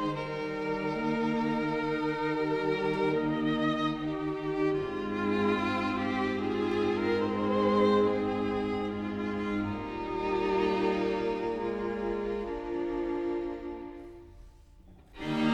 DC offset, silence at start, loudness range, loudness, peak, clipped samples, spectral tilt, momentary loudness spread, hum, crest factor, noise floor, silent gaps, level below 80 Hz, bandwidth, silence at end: under 0.1%; 0 s; 6 LU; -30 LUFS; -14 dBFS; under 0.1%; -7 dB/octave; 7 LU; none; 16 dB; -54 dBFS; none; -54 dBFS; 9.6 kHz; 0 s